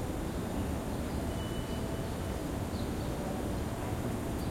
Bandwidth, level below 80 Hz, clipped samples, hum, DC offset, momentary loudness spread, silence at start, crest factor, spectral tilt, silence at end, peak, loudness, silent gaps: 16.5 kHz; -42 dBFS; under 0.1%; none; under 0.1%; 1 LU; 0 s; 14 dB; -6 dB/octave; 0 s; -22 dBFS; -36 LUFS; none